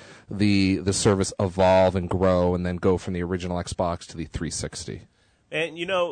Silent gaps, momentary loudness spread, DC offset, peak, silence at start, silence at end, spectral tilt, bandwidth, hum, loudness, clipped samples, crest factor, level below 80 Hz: none; 13 LU; under 0.1%; -10 dBFS; 0 s; 0 s; -5.5 dB/octave; 9.6 kHz; none; -24 LUFS; under 0.1%; 14 dB; -46 dBFS